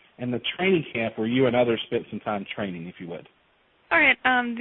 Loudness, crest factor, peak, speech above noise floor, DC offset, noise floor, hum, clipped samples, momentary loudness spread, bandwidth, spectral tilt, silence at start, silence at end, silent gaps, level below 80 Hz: -24 LUFS; 20 dB; -6 dBFS; 39 dB; under 0.1%; -63 dBFS; none; under 0.1%; 18 LU; 4.2 kHz; -10 dB/octave; 0.2 s; 0 s; none; -60 dBFS